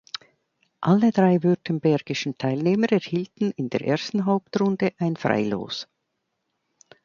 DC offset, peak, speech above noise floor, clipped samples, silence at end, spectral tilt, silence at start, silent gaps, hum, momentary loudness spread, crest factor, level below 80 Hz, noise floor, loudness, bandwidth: under 0.1%; -4 dBFS; 55 dB; under 0.1%; 1.2 s; -7 dB/octave; 0.8 s; none; none; 10 LU; 20 dB; -66 dBFS; -77 dBFS; -23 LUFS; 7.2 kHz